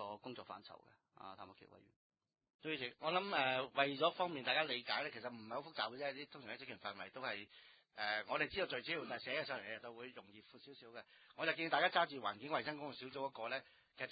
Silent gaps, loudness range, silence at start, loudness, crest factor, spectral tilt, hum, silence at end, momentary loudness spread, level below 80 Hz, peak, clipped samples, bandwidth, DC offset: 1.96-2.10 s, 2.54-2.59 s; 6 LU; 0 s; -41 LUFS; 24 dB; -0.5 dB/octave; none; 0 s; 20 LU; -80 dBFS; -18 dBFS; under 0.1%; 4.9 kHz; under 0.1%